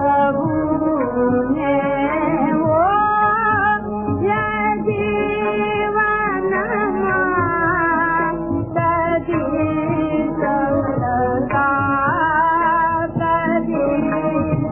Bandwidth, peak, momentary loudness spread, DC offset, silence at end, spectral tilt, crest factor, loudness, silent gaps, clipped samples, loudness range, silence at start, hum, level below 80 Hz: 3.6 kHz; -4 dBFS; 4 LU; under 0.1%; 0 s; -11 dB/octave; 12 dB; -18 LUFS; none; under 0.1%; 2 LU; 0 s; none; -40 dBFS